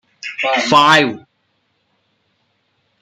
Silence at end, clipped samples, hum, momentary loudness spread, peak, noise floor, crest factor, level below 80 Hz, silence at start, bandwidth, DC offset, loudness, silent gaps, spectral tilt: 1.85 s; under 0.1%; none; 18 LU; 0 dBFS; -65 dBFS; 18 dB; -60 dBFS; 0.25 s; 15.5 kHz; under 0.1%; -12 LUFS; none; -3.5 dB/octave